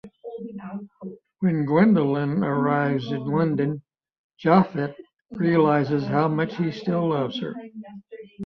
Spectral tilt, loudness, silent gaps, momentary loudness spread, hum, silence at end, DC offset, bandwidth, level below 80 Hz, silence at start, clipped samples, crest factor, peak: -9.5 dB/octave; -23 LUFS; 4.18-4.30 s, 5.21-5.25 s; 21 LU; none; 0 s; under 0.1%; 6.2 kHz; -64 dBFS; 0.05 s; under 0.1%; 20 dB; -4 dBFS